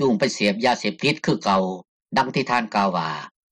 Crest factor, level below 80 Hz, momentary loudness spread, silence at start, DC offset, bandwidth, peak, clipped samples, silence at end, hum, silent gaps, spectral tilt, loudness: 16 dB; -62 dBFS; 8 LU; 0 s; under 0.1%; 11.5 kHz; -8 dBFS; under 0.1%; 0.25 s; none; 1.88-2.00 s; -5 dB/octave; -22 LUFS